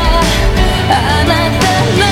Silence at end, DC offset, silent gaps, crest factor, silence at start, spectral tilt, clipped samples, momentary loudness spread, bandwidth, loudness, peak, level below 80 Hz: 0 s; under 0.1%; none; 10 dB; 0 s; -4.5 dB/octave; under 0.1%; 2 LU; 17 kHz; -11 LUFS; 0 dBFS; -16 dBFS